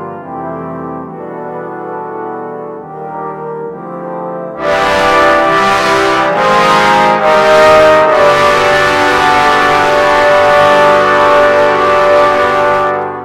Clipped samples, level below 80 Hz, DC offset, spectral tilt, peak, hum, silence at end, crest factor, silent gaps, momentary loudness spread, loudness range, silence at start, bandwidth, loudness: under 0.1%; -40 dBFS; under 0.1%; -4 dB/octave; 0 dBFS; none; 0 s; 10 dB; none; 16 LU; 15 LU; 0 s; 15.5 kHz; -8 LUFS